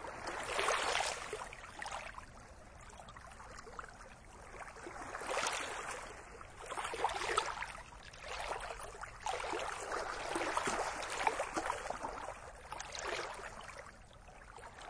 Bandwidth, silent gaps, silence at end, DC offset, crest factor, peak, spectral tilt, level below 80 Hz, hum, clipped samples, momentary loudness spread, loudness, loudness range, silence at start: 10.5 kHz; none; 0 s; under 0.1%; 26 dB; -16 dBFS; -2 dB/octave; -60 dBFS; none; under 0.1%; 17 LU; -40 LUFS; 9 LU; 0 s